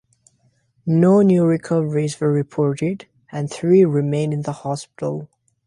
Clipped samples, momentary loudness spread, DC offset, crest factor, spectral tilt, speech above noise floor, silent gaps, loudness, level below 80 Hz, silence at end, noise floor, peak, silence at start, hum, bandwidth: under 0.1%; 14 LU; under 0.1%; 16 dB; -8 dB/octave; 44 dB; none; -19 LUFS; -60 dBFS; 0.4 s; -62 dBFS; -4 dBFS; 0.85 s; none; 11.5 kHz